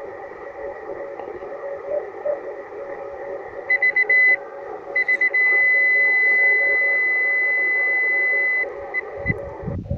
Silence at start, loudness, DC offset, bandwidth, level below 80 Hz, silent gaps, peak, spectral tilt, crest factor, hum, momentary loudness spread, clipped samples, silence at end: 0 s; -17 LUFS; under 0.1%; 4.8 kHz; -50 dBFS; none; -6 dBFS; -7 dB/octave; 14 dB; none; 19 LU; under 0.1%; 0 s